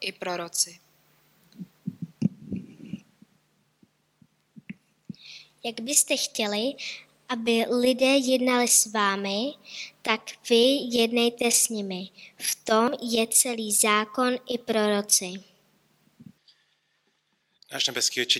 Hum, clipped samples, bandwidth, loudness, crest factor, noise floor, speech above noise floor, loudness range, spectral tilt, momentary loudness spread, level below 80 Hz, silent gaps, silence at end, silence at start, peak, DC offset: none; under 0.1%; 17.5 kHz; -24 LUFS; 20 dB; -72 dBFS; 47 dB; 15 LU; -2 dB/octave; 20 LU; -72 dBFS; none; 0 s; 0 s; -6 dBFS; under 0.1%